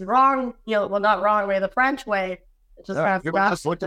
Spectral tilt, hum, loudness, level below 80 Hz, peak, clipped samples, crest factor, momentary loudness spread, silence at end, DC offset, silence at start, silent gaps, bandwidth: -5.5 dB/octave; none; -22 LUFS; -54 dBFS; -6 dBFS; under 0.1%; 14 dB; 7 LU; 0 s; under 0.1%; 0 s; none; 14.5 kHz